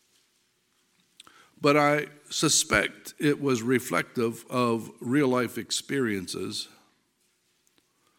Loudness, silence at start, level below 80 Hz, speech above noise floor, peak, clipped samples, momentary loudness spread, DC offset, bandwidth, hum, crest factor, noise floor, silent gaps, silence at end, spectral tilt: -26 LUFS; 1.6 s; -60 dBFS; 45 dB; -6 dBFS; under 0.1%; 11 LU; under 0.1%; 17 kHz; none; 22 dB; -71 dBFS; none; 1.55 s; -3.5 dB/octave